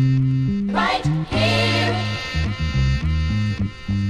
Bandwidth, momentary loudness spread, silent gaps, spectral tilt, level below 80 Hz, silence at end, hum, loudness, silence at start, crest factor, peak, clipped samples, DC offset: 11.5 kHz; 6 LU; none; -6 dB/octave; -30 dBFS; 0 s; none; -21 LUFS; 0 s; 14 dB; -6 dBFS; under 0.1%; under 0.1%